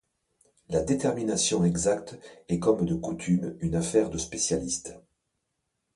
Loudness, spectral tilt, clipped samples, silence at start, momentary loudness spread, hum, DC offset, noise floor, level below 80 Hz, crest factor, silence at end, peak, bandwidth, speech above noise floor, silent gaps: -27 LUFS; -5 dB/octave; under 0.1%; 0.7 s; 8 LU; none; under 0.1%; -80 dBFS; -50 dBFS; 18 dB; 0.95 s; -10 dBFS; 11.5 kHz; 53 dB; none